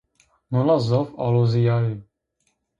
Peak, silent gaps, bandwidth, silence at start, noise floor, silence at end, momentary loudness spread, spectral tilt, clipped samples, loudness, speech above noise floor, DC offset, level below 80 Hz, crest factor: -8 dBFS; none; 7.4 kHz; 0.5 s; -72 dBFS; 0.75 s; 8 LU; -9 dB/octave; under 0.1%; -21 LUFS; 52 dB; under 0.1%; -56 dBFS; 14 dB